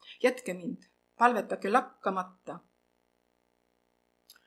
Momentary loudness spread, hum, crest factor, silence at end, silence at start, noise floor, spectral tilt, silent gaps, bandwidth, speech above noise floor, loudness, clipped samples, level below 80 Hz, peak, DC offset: 20 LU; 60 Hz at -55 dBFS; 26 dB; 1.9 s; 0.05 s; -74 dBFS; -5 dB/octave; none; 13.5 kHz; 44 dB; -30 LUFS; under 0.1%; -86 dBFS; -8 dBFS; under 0.1%